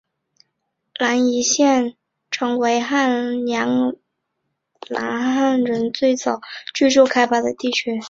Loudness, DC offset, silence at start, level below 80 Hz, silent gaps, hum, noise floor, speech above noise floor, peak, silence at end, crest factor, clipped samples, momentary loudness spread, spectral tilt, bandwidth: -19 LUFS; under 0.1%; 1 s; -64 dBFS; none; none; -75 dBFS; 57 dB; -2 dBFS; 0 s; 18 dB; under 0.1%; 12 LU; -2.5 dB/octave; 7.8 kHz